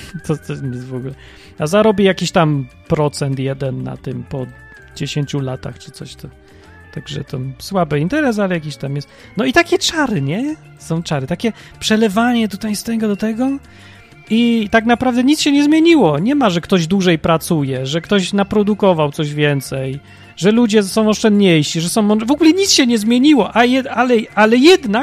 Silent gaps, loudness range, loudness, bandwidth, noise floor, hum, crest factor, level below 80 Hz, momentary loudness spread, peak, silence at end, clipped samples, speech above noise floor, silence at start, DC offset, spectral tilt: none; 10 LU; -15 LUFS; 15.5 kHz; -41 dBFS; none; 16 dB; -46 dBFS; 15 LU; 0 dBFS; 0 s; under 0.1%; 26 dB; 0 s; under 0.1%; -5 dB/octave